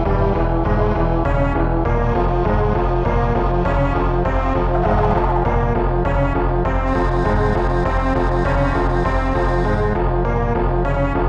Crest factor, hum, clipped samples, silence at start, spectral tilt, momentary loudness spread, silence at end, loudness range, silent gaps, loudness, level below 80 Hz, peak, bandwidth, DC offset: 12 dB; none; under 0.1%; 0 s; -9 dB/octave; 1 LU; 0 s; 0 LU; none; -18 LUFS; -22 dBFS; -4 dBFS; 6.8 kHz; under 0.1%